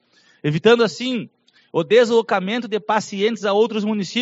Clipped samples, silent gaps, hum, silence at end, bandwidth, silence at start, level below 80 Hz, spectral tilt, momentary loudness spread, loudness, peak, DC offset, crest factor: under 0.1%; none; none; 0 s; 8 kHz; 0.45 s; -68 dBFS; -3.5 dB/octave; 10 LU; -19 LUFS; -2 dBFS; under 0.1%; 18 dB